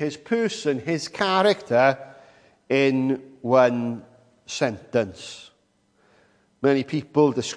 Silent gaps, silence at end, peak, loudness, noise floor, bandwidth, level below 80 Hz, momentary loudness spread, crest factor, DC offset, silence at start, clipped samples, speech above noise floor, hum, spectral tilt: none; 0 s; -4 dBFS; -23 LUFS; -65 dBFS; 10.5 kHz; -68 dBFS; 13 LU; 20 dB; under 0.1%; 0 s; under 0.1%; 43 dB; none; -5 dB/octave